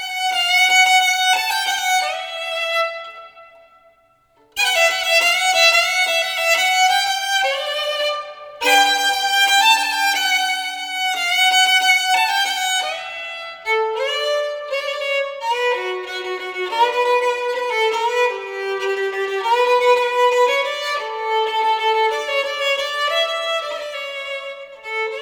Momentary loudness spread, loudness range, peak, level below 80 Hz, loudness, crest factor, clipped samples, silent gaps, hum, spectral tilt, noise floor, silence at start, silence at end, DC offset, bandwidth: 13 LU; 6 LU; -2 dBFS; -64 dBFS; -17 LUFS; 18 dB; under 0.1%; none; none; 2 dB/octave; -57 dBFS; 0 s; 0 s; under 0.1%; over 20 kHz